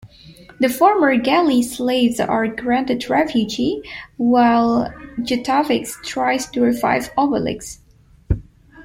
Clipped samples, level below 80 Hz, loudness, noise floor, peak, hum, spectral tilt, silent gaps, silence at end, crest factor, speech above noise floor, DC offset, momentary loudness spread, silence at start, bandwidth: under 0.1%; -40 dBFS; -18 LUFS; -44 dBFS; -2 dBFS; none; -5 dB/octave; none; 0 s; 16 dB; 26 dB; under 0.1%; 11 LU; 0.05 s; 16.5 kHz